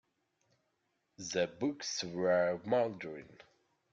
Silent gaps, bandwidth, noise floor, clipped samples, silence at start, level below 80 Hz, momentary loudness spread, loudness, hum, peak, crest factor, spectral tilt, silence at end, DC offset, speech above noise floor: none; 7.8 kHz; -81 dBFS; under 0.1%; 1.2 s; -76 dBFS; 15 LU; -34 LUFS; none; -20 dBFS; 18 dB; -4 dB/octave; 0.6 s; under 0.1%; 46 dB